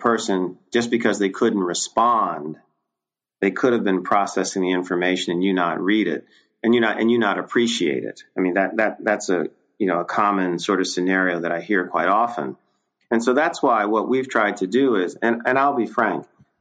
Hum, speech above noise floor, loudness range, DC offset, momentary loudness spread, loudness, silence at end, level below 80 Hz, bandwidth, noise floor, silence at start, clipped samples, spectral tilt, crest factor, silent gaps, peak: none; 66 dB; 2 LU; under 0.1%; 6 LU; -21 LUFS; 0.35 s; -68 dBFS; 9.6 kHz; -86 dBFS; 0 s; under 0.1%; -4.5 dB/octave; 16 dB; none; -4 dBFS